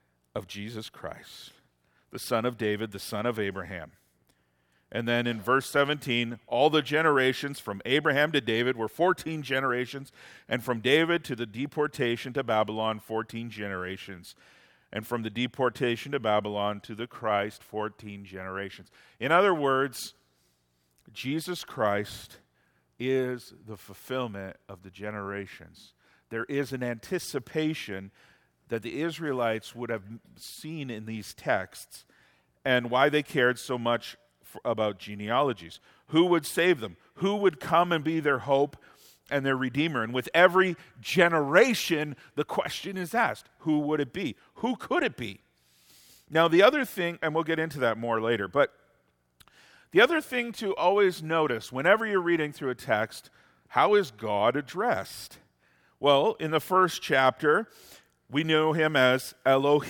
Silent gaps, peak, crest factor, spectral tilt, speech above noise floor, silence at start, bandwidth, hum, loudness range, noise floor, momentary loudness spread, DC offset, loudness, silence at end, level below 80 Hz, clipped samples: none; -4 dBFS; 24 dB; -5 dB/octave; 44 dB; 0.35 s; 18 kHz; none; 9 LU; -71 dBFS; 16 LU; under 0.1%; -27 LUFS; 0 s; -68 dBFS; under 0.1%